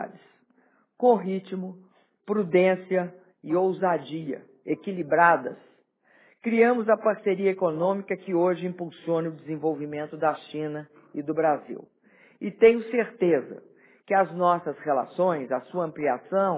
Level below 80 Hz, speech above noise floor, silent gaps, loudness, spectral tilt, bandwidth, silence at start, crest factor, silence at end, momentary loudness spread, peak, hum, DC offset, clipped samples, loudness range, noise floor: -76 dBFS; 40 dB; none; -25 LUFS; -10.5 dB/octave; 4 kHz; 0 s; 20 dB; 0 s; 16 LU; -6 dBFS; none; under 0.1%; under 0.1%; 5 LU; -64 dBFS